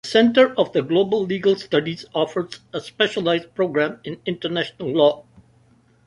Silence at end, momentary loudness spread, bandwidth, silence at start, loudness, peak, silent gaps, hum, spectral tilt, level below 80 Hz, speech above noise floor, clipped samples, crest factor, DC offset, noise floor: 0.85 s; 12 LU; 11 kHz; 0.05 s; -21 LUFS; -2 dBFS; none; none; -5.5 dB/octave; -62 dBFS; 36 dB; under 0.1%; 20 dB; under 0.1%; -56 dBFS